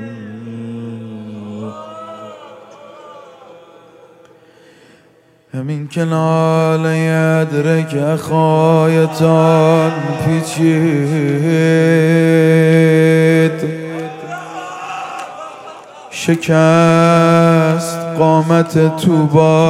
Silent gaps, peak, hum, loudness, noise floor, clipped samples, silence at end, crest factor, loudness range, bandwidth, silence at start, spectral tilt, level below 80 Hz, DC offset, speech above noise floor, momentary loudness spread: none; 0 dBFS; none; -12 LUFS; -50 dBFS; under 0.1%; 0 s; 14 dB; 18 LU; 13.5 kHz; 0 s; -7 dB/octave; -58 dBFS; under 0.1%; 39 dB; 19 LU